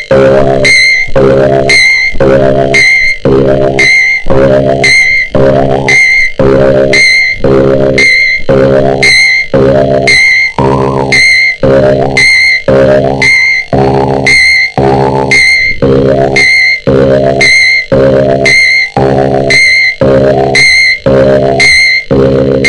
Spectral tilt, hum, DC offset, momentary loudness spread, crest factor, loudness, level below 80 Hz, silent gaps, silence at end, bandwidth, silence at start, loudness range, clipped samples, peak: -4 dB/octave; none; 1%; 5 LU; 6 dB; -4 LUFS; -26 dBFS; none; 0 s; 12 kHz; 0 s; 1 LU; 2%; 0 dBFS